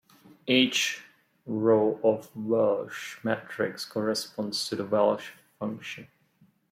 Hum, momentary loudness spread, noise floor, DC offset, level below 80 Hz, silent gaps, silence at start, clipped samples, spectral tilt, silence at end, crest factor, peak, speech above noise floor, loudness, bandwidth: none; 16 LU; -64 dBFS; under 0.1%; -76 dBFS; none; 0.45 s; under 0.1%; -4 dB/octave; 0.65 s; 20 dB; -8 dBFS; 37 dB; -27 LUFS; 16 kHz